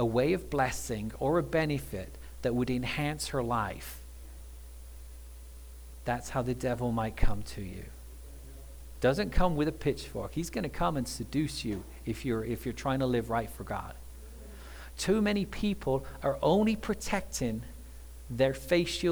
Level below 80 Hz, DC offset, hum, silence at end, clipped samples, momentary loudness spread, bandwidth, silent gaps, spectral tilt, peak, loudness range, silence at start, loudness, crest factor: -42 dBFS; under 0.1%; none; 0 s; under 0.1%; 20 LU; over 20 kHz; none; -5.5 dB/octave; -10 dBFS; 5 LU; 0 s; -32 LUFS; 22 dB